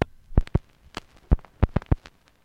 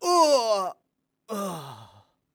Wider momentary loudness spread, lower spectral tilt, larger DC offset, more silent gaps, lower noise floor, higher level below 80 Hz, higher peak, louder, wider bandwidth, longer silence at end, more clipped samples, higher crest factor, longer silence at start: second, 16 LU vs 19 LU; first, -8.5 dB/octave vs -3.5 dB/octave; neither; neither; second, -46 dBFS vs -77 dBFS; first, -28 dBFS vs -80 dBFS; first, -4 dBFS vs -8 dBFS; second, -27 LUFS vs -24 LUFS; second, 9.2 kHz vs over 20 kHz; about the same, 0.5 s vs 0.5 s; neither; about the same, 22 dB vs 18 dB; about the same, 0 s vs 0 s